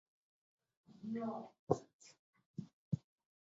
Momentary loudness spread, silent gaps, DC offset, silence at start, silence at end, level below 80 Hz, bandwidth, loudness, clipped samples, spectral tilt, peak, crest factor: 21 LU; 1.59-1.67 s, 1.93-1.99 s, 2.19-2.33 s, 2.46-2.54 s, 2.73-2.91 s; under 0.1%; 0.9 s; 0.4 s; -72 dBFS; 7.6 kHz; -45 LUFS; under 0.1%; -9 dB/octave; -18 dBFS; 28 dB